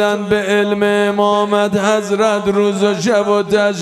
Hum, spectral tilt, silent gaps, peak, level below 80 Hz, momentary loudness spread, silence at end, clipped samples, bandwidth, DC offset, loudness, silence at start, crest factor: none; -5 dB/octave; none; 0 dBFS; -52 dBFS; 1 LU; 0 s; under 0.1%; 13.5 kHz; under 0.1%; -14 LUFS; 0 s; 14 dB